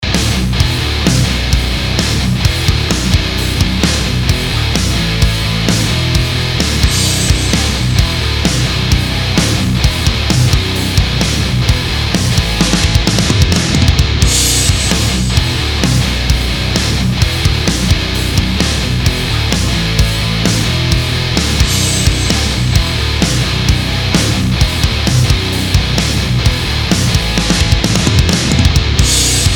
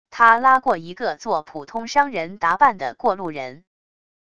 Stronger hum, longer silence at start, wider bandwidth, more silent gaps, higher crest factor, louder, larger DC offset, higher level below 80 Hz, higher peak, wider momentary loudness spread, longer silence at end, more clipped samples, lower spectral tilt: neither; about the same, 0 s vs 0.1 s; first, 20 kHz vs 11 kHz; neither; second, 12 dB vs 20 dB; first, -12 LUFS vs -19 LUFS; second, under 0.1% vs 0.5%; first, -18 dBFS vs -60 dBFS; about the same, 0 dBFS vs 0 dBFS; second, 3 LU vs 15 LU; second, 0 s vs 0.8 s; first, 0.3% vs under 0.1%; about the same, -4 dB/octave vs -4 dB/octave